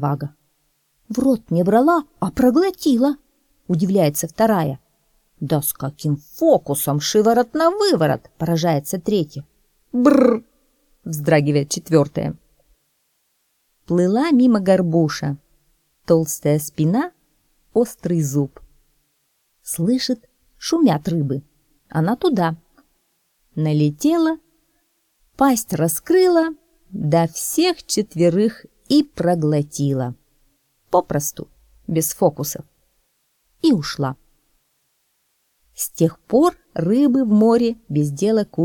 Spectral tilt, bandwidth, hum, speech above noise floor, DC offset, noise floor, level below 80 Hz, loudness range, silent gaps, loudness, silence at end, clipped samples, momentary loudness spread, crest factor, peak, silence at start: -6 dB/octave; 19 kHz; none; 50 dB; under 0.1%; -67 dBFS; -54 dBFS; 5 LU; none; -19 LUFS; 0 s; under 0.1%; 12 LU; 18 dB; 0 dBFS; 0 s